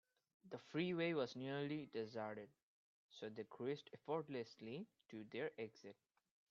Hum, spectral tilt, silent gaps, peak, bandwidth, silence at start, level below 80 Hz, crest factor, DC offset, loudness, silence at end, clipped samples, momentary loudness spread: none; -5 dB/octave; 2.63-3.09 s; -28 dBFS; 7.4 kHz; 0.45 s; -90 dBFS; 20 dB; under 0.1%; -48 LUFS; 0.55 s; under 0.1%; 15 LU